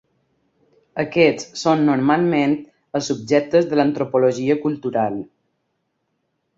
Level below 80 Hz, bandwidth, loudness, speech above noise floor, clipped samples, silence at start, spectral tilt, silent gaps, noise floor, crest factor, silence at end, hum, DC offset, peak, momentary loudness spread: -62 dBFS; 7.8 kHz; -19 LUFS; 54 dB; under 0.1%; 0.95 s; -6 dB/octave; none; -72 dBFS; 18 dB; 1.35 s; none; under 0.1%; -2 dBFS; 10 LU